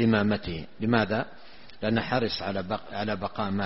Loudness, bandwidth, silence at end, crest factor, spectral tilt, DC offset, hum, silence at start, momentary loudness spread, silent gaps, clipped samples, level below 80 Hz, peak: -28 LUFS; 6 kHz; 0 s; 20 dB; -4.5 dB/octave; 0.6%; none; 0 s; 8 LU; none; under 0.1%; -54 dBFS; -8 dBFS